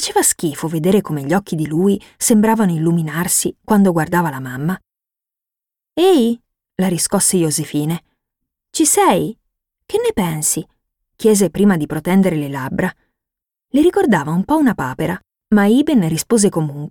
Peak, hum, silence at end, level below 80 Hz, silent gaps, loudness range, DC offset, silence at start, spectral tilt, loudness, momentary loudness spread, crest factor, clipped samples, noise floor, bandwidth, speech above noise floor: -2 dBFS; none; 0 s; -50 dBFS; none; 2 LU; under 0.1%; 0 s; -5 dB/octave; -16 LUFS; 10 LU; 16 dB; under 0.1%; -87 dBFS; 18.5 kHz; 71 dB